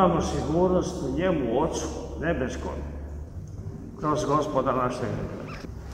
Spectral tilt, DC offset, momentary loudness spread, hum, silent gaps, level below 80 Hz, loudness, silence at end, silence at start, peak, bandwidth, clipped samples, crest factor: -6.5 dB/octave; under 0.1%; 14 LU; none; none; -40 dBFS; -27 LUFS; 0 s; 0 s; -6 dBFS; 15 kHz; under 0.1%; 22 dB